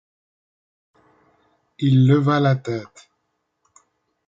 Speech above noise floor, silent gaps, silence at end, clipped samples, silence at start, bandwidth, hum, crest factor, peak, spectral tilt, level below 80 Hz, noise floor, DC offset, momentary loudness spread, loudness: 56 dB; none; 1.45 s; under 0.1%; 1.8 s; 7.6 kHz; none; 18 dB; -4 dBFS; -8.5 dB/octave; -64 dBFS; -74 dBFS; under 0.1%; 13 LU; -19 LUFS